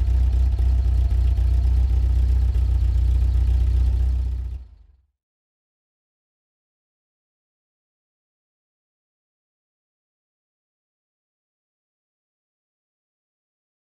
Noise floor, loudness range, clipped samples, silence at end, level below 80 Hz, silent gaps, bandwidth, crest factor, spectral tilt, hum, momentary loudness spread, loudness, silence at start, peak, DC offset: -53 dBFS; 11 LU; under 0.1%; 9.2 s; -24 dBFS; none; 4.5 kHz; 12 dB; -8 dB/octave; none; 4 LU; -22 LUFS; 0 s; -12 dBFS; under 0.1%